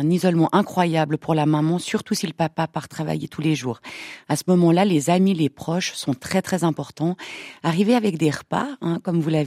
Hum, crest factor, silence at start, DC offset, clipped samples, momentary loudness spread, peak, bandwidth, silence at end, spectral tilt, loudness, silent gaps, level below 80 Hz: none; 18 dB; 0 s; under 0.1%; under 0.1%; 9 LU; -2 dBFS; 15 kHz; 0 s; -6 dB/octave; -22 LUFS; none; -62 dBFS